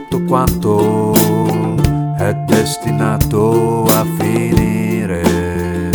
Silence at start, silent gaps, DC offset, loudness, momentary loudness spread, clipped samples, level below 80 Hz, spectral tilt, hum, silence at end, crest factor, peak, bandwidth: 0 s; none; under 0.1%; -14 LUFS; 5 LU; under 0.1%; -30 dBFS; -6 dB/octave; none; 0 s; 14 dB; 0 dBFS; over 20 kHz